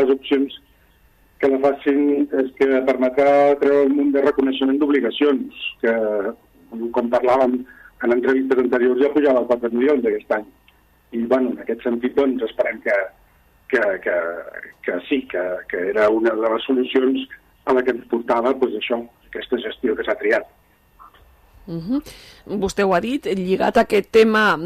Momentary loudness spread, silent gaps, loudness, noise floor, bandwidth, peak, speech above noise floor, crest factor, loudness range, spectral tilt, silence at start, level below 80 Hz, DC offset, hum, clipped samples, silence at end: 11 LU; none; -19 LUFS; -55 dBFS; 14 kHz; -4 dBFS; 37 dB; 16 dB; 7 LU; -6 dB/octave; 0 s; -54 dBFS; under 0.1%; none; under 0.1%; 0 s